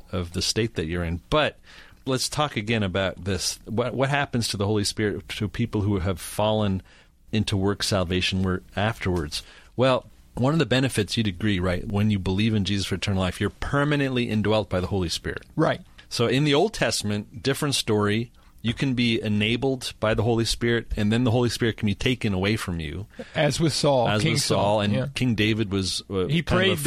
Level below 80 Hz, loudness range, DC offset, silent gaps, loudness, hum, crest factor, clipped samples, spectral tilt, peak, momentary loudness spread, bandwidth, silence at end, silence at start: -44 dBFS; 3 LU; under 0.1%; none; -24 LUFS; none; 16 dB; under 0.1%; -5 dB/octave; -8 dBFS; 7 LU; 15 kHz; 0 s; 0.05 s